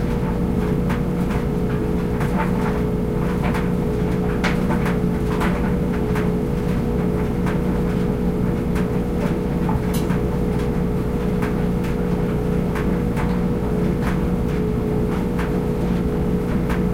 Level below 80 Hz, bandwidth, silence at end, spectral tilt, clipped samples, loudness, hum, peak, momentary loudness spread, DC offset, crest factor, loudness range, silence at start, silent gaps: -28 dBFS; 16 kHz; 0 s; -8 dB/octave; under 0.1%; -21 LUFS; 60 Hz at -30 dBFS; -6 dBFS; 1 LU; under 0.1%; 14 dB; 1 LU; 0 s; none